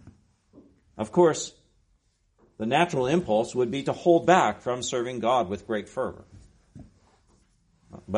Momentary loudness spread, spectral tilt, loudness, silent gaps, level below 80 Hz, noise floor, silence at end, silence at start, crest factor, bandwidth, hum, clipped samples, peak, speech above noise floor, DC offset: 12 LU; -5 dB/octave; -25 LUFS; none; -60 dBFS; -68 dBFS; 0 s; 0.05 s; 20 dB; 10.5 kHz; none; under 0.1%; -6 dBFS; 44 dB; under 0.1%